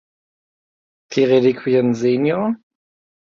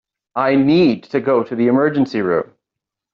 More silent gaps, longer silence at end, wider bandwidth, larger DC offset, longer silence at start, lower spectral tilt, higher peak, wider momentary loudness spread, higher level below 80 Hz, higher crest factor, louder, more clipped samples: neither; about the same, 0.7 s vs 0.7 s; about the same, 7.2 kHz vs 6.6 kHz; neither; first, 1.1 s vs 0.35 s; first, -7 dB/octave vs -5.5 dB/octave; about the same, -4 dBFS vs -4 dBFS; about the same, 9 LU vs 8 LU; second, -64 dBFS vs -56 dBFS; about the same, 16 dB vs 12 dB; about the same, -17 LUFS vs -16 LUFS; neither